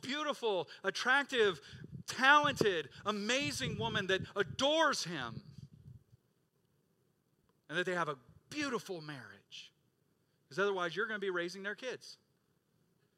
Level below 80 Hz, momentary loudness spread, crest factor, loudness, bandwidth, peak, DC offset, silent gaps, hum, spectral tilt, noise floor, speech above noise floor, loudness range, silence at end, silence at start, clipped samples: -72 dBFS; 19 LU; 24 dB; -34 LUFS; 15.5 kHz; -12 dBFS; under 0.1%; none; none; -3.5 dB/octave; -77 dBFS; 42 dB; 10 LU; 1.05 s; 0.05 s; under 0.1%